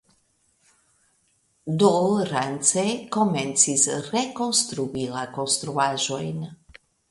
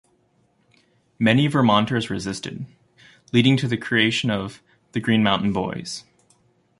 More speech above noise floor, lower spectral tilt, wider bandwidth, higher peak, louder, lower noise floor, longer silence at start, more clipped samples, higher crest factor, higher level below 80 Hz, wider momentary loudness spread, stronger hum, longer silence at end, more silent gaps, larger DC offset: about the same, 43 dB vs 43 dB; second, -3.5 dB/octave vs -5.5 dB/octave; about the same, 11.5 kHz vs 11.5 kHz; about the same, -4 dBFS vs -4 dBFS; about the same, -23 LUFS vs -21 LUFS; about the same, -67 dBFS vs -64 dBFS; first, 1.65 s vs 1.2 s; neither; about the same, 22 dB vs 20 dB; second, -64 dBFS vs -54 dBFS; second, 11 LU vs 16 LU; neither; second, 0.55 s vs 0.8 s; neither; neither